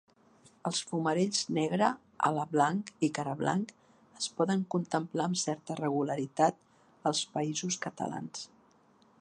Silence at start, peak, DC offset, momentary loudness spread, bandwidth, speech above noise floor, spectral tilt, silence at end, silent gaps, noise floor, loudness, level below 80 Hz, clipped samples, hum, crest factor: 0.65 s; -12 dBFS; under 0.1%; 9 LU; 11 kHz; 33 dB; -4.5 dB/octave; 0.75 s; none; -64 dBFS; -32 LUFS; -78 dBFS; under 0.1%; none; 22 dB